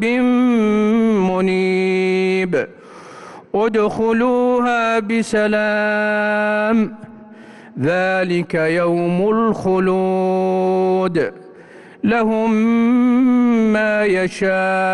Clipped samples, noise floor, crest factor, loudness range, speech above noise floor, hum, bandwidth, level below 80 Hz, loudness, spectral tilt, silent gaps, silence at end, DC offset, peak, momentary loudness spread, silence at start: under 0.1%; -41 dBFS; 8 dB; 2 LU; 25 dB; none; 11 kHz; -52 dBFS; -17 LUFS; -7 dB/octave; none; 0 s; under 0.1%; -8 dBFS; 6 LU; 0 s